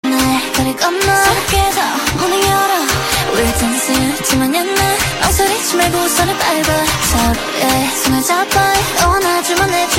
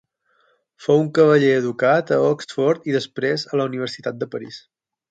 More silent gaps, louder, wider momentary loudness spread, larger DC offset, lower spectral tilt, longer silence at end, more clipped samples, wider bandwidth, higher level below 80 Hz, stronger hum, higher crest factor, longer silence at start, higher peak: neither; first, -13 LUFS vs -19 LUFS; second, 2 LU vs 14 LU; neither; second, -3 dB/octave vs -6.5 dB/octave; second, 0 s vs 0.5 s; neither; first, 16.5 kHz vs 9 kHz; first, -28 dBFS vs -68 dBFS; neither; about the same, 14 dB vs 18 dB; second, 0.05 s vs 0.8 s; about the same, 0 dBFS vs -2 dBFS